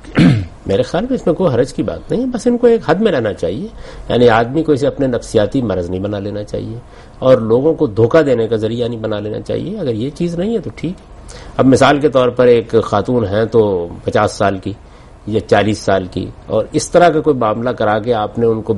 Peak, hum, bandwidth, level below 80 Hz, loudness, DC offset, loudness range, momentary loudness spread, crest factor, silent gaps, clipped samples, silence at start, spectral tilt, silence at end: 0 dBFS; none; 11.5 kHz; -38 dBFS; -15 LUFS; under 0.1%; 3 LU; 13 LU; 14 dB; none; under 0.1%; 0.05 s; -6.5 dB/octave; 0 s